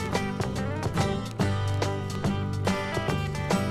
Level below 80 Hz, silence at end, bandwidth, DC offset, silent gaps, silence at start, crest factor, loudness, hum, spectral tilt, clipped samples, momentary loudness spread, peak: -44 dBFS; 0 s; 14 kHz; under 0.1%; none; 0 s; 18 dB; -29 LUFS; none; -6 dB/octave; under 0.1%; 2 LU; -10 dBFS